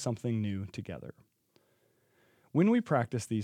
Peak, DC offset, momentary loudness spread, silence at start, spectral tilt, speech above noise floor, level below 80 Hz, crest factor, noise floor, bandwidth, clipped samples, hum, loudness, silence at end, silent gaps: -14 dBFS; under 0.1%; 17 LU; 0 s; -7 dB/octave; 40 dB; -74 dBFS; 20 dB; -71 dBFS; 14.5 kHz; under 0.1%; none; -31 LUFS; 0 s; none